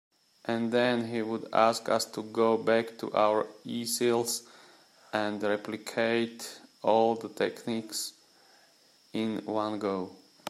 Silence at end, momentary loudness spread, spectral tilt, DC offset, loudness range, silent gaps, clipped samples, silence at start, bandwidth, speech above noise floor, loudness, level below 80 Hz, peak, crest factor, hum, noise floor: 0 s; 10 LU; -4 dB/octave; under 0.1%; 4 LU; none; under 0.1%; 0.45 s; 15.5 kHz; 33 dB; -30 LUFS; -78 dBFS; -8 dBFS; 22 dB; none; -62 dBFS